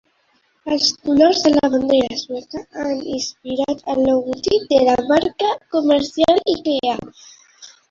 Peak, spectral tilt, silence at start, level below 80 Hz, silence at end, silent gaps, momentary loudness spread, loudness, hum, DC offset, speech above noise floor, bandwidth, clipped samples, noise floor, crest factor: -2 dBFS; -4 dB/octave; 0.65 s; -50 dBFS; 0.2 s; none; 11 LU; -18 LUFS; none; under 0.1%; 44 dB; 7.8 kHz; under 0.1%; -62 dBFS; 16 dB